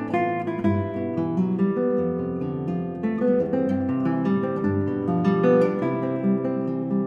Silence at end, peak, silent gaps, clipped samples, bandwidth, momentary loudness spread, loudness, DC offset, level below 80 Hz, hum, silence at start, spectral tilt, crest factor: 0 s; -8 dBFS; none; under 0.1%; 6.6 kHz; 7 LU; -24 LUFS; under 0.1%; -60 dBFS; none; 0 s; -10 dB/octave; 16 dB